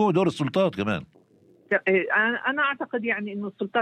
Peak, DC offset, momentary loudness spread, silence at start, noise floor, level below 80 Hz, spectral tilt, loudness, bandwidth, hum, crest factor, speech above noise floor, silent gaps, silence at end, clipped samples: -8 dBFS; under 0.1%; 7 LU; 0 s; -58 dBFS; -64 dBFS; -6.5 dB/octave; -25 LUFS; 10.5 kHz; none; 16 dB; 33 dB; none; 0 s; under 0.1%